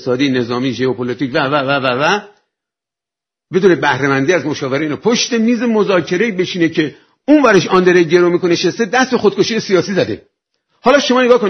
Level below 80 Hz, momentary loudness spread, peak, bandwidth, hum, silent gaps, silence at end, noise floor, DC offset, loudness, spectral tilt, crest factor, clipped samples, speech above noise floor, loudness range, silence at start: -54 dBFS; 8 LU; 0 dBFS; 6.6 kHz; none; none; 0 s; -86 dBFS; under 0.1%; -14 LUFS; -5 dB/octave; 14 dB; under 0.1%; 73 dB; 4 LU; 0 s